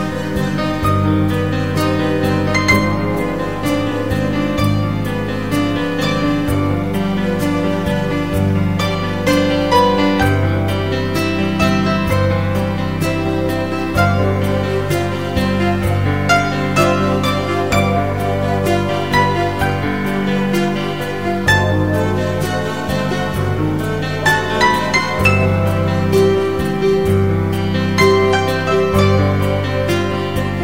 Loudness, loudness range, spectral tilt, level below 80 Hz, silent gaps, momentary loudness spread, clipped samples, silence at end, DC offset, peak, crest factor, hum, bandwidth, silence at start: -16 LUFS; 3 LU; -6 dB/octave; -34 dBFS; none; 5 LU; under 0.1%; 0 s; 2%; -2 dBFS; 14 dB; none; 16.5 kHz; 0 s